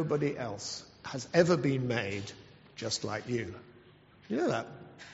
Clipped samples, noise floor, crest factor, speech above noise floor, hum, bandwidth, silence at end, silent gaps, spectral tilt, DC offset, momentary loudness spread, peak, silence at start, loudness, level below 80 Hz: under 0.1%; -58 dBFS; 24 dB; 27 dB; none; 8 kHz; 0 s; none; -5 dB/octave; under 0.1%; 19 LU; -10 dBFS; 0 s; -32 LUFS; -66 dBFS